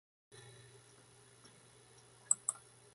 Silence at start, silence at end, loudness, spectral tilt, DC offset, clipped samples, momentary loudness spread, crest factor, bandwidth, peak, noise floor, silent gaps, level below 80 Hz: 2.3 s; 0.4 s; -35 LUFS; -0.5 dB/octave; under 0.1%; under 0.1%; 27 LU; 34 dB; 11.5 kHz; -12 dBFS; -63 dBFS; none; -84 dBFS